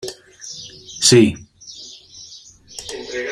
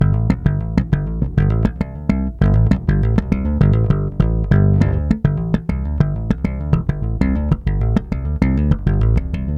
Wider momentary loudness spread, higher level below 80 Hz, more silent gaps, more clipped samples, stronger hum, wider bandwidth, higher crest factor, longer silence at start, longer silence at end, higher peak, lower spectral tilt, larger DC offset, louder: first, 25 LU vs 5 LU; second, -54 dBFS vs -22 dBFS; neither; neither; neither; first, 15 kHz vs 7.2 kHz; about the same, 20 dB vs 16 dB; about the same, 0.05 s vs 0 s; about the same, 0 s vs 0 s; about the same, 0 dBFS vs 0 dBFS; second, -3.5 dB/octave vs -10 dB/octave; neither; first, -15 LUFS vs -18 LUFS